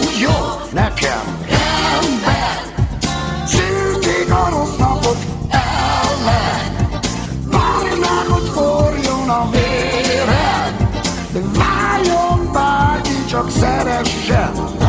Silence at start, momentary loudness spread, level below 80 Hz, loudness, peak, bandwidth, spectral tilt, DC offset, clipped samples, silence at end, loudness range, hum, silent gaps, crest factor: 0 s; 5 LU; -26 dBFS; -16 LUFS; -2 dBFS; 8 kHz; -5 dB/octave; under 0.1%; under 0.1%; 0 s; 1 LU; none; none; 14 dB